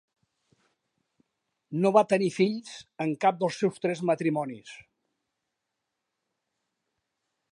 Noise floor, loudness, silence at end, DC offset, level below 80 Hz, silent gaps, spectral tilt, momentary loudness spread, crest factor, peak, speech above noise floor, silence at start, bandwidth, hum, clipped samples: -84 dBFS; -27 LUFS; 2.75 s; under 0.1%; -78 dBFS; none; -6 dB/octave; 15 LU; 24 dB; -6 dBFS; 57 dB; 1.7 s; 11 kHz; none; under 0.1%